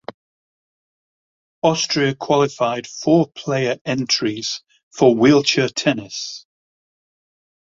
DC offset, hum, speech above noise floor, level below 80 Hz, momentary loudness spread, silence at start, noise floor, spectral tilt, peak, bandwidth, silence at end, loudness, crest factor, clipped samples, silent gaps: under 0.1%; none; over 72 dB; -60 dBFS; 14 LU; 1.65 s; under -90 dBFS; -4.5 dB/octave; -2 dBFS; 7.8 kHz; 1.25 s; -18 LUFS; 18 dB; under 0.1%; 3.81-3.85 s, 4.83-4.91 s